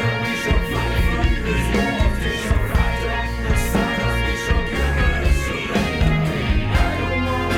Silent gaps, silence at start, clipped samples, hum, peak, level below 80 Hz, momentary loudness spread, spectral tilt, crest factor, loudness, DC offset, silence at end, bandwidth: none; 0 s; under 0.1%; none; -6 dBFS; -22 dBFS; 2 LU; -5.5 dB/octave; 14 dB; -20 LUFS; under 0.1%; 0 s; 16.5 kHz